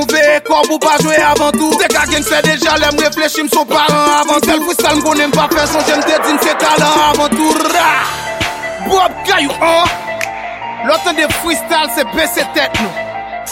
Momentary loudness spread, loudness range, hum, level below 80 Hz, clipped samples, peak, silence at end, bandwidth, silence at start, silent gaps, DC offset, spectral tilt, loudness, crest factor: 8 LU; 3 LU; none; -38 dBFS; under 0.1%; 0 dBFS; 0 s; 16.5 kHz; 0 s; none; under 0.1%; -2.5 dB/octave; -11 LUFS; 12 dB